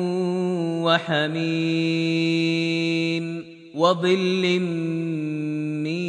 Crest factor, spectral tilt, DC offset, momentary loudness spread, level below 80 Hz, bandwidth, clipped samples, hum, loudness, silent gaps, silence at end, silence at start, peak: 18 dB; -6 dB/octave; under 0.1%; 6 LU; -72 dBFS; 9.6 kHz; under 0.1%; none; -23 LUFS; none; 0 s; 0 s; -4 dBFS